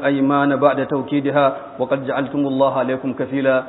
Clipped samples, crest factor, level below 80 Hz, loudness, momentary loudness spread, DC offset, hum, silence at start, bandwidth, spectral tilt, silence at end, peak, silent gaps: under 0.1%; 18 dB; -62 dBFS; -19 LUFS; 6 LU; under 0.1%; none; 0 s; 4.1 kHz; -12 dB/octave; 0 s; 0 dBFS; none